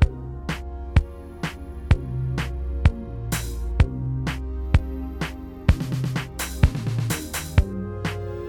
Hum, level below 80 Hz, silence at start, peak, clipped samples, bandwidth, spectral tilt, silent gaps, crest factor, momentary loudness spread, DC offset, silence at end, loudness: none; -28 dBFS; 0 s; -4 dBFS; under 0.1%; 17.5 kHz; -6 dB/octave; none; 20 dB; 9 LU; under 0.1%; 0 s; -26 LUFS